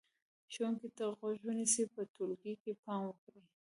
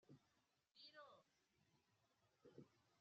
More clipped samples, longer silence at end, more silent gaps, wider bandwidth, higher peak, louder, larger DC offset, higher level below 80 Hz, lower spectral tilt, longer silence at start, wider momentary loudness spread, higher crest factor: neither; first, 0.2 s vs 0 s; first, 2.10-2.14 s, 2.60-2.65 s, 2.79-2.83 s, 3.18-3.27 s vs none; first, 11.5 kHz vs 7 kHz; first, -20 dBFS vs -50 dBFS; first, -39 LUFS vs -67 LUFS; neither; about the same, -90 dBFS vs under -90 dBFS; about the same, -3.5 dB/octave vs -3 dB/octave; first, 0.5 s vs 0 s; first, 12 LU vs 5 LU; about the same, 22 dB vs 22 dB